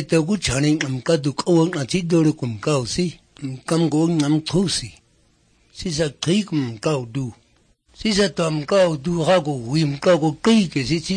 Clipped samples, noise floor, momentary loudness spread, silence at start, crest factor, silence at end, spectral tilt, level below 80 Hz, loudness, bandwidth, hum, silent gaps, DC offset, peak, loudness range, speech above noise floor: under 0.1%; -59 dBFS; 9 LU; 0 s; 16 dB; 0 s; -5.5 dB/octave; -48 dBFS; -20 LUFS; 9.8 kHz; none; none; under 0.1%; -4 dBFS; 5 LU; 40 dB